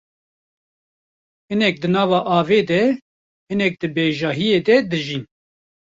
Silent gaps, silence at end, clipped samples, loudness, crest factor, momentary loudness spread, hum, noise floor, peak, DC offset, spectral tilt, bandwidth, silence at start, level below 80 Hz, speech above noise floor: 3.02-3.47 s; 0.7 s; under 0.1%; -19 LUFS; 18 dB; 10 LU; none; under -90 dBFS; -2 dBFS; under 0.1%; -6.5 dB/octave; 7.8 kHz; 1.5 s; -60 dBFS; over 72 dB